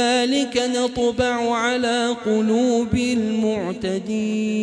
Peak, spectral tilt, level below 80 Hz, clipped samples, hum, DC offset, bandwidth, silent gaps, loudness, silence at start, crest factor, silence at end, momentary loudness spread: -6 dBFS; -4.5 dB/octave; -48 dBFS; under 0.1%; none; under 0.1%; 11 kHz; none; -21 LUFS; 0 s; 14 dB; 0 s; 5 LU